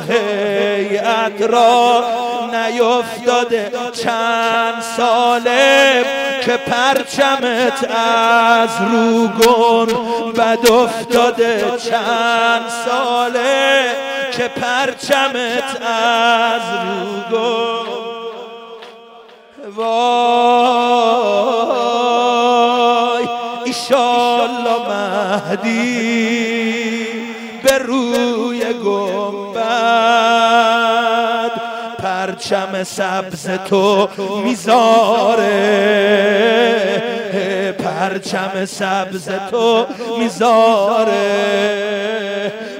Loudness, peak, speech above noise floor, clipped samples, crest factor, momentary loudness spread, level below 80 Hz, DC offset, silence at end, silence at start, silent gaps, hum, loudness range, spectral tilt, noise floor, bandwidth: -15 LUFS; 0 dBFS; 26 dB; under 0.1%; 14 dB; 9 LU; -58 dBFS; under 0.1%; 0 s; 0 s; none; none; 5 LU; -3.5 dB/octave; -41 dBFS; 16 kHz